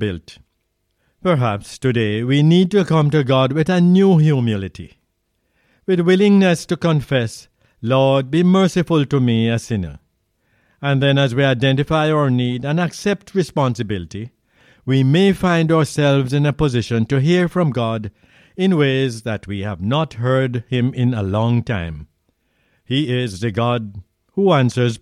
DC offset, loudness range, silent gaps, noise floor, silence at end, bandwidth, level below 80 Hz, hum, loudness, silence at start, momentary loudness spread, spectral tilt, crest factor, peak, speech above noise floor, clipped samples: under 0.1%; 5 LU; none; -69 dBFS; 0.05 s; 12 kHz; -46 dBFS; none; -17 LUFS; 0 s; 12 LU; -7 dB/octave; 14 dB; -4 dBFS; 53 dB; under 0.1%